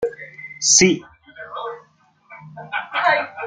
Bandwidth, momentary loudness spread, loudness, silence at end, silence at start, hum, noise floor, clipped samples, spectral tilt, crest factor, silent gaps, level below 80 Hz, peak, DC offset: 10.5 kHz; 26 LU; -17 LUFS; 0 s; 0 s; none; -55 dBFS; under 0.1%; -2 dB/octave; 20 dB; none; -58 dBFS; -2 dBFS; under 0.1%